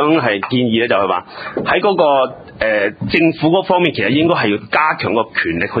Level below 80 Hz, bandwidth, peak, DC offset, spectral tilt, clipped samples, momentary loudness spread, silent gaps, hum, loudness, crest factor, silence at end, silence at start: -46 dBFS; 5 kHz; 0 dBFS; under 0.1%; -8.5 dB/octave; under 0.1%; 5 LU; none; none; -15 LUFS; 14 dB; 0 s; 0 s